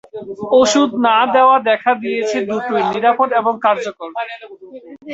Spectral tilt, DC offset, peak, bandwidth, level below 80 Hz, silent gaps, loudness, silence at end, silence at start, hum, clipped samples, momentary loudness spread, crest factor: -3.5 dB/octave; under 0.1%; -2 dBFS; 8 kHz; -60 dBFS; none; -15 LUFS; 0 s; 0.15 s; none; under 0.1%; 16 LU; 14 dB